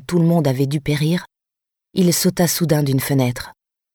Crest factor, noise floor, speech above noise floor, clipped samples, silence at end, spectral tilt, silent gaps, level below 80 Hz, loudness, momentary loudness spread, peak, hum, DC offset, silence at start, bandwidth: 16 dB; -85 dBFS; 68 dB; under 0.1%; 0.45 s; -5.5 dB/octave; none; -48 dBFS; -18 LUFS; 8 LU; -2 dBFS; none; under 0.1%; 0.1 s; over 20 kHz